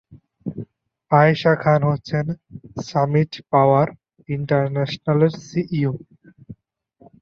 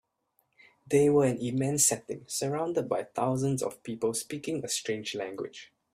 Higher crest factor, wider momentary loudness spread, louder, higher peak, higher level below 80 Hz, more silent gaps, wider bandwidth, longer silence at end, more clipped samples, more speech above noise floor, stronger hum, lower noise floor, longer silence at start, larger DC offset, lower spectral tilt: about the same, 18 dB vs 20 dB; first, 17 LU vs 12 LU; first, -20 LUFS vs -29 LUFS; first, -2 dBFS vs -10 dBFS; first, -56 dBFS vs -68 dBFS; neither; second, 6.8 kHz vs 16 kHz; first, 0.7 s vs 0.3 s; neither; second, 39 dB vs 46 dB; neither; second, -57 dBFS vs -75 dBFS; second, 0.1 s vs 0.9 s; neither; first, -8 dB/octave vs -4.5 dB/octave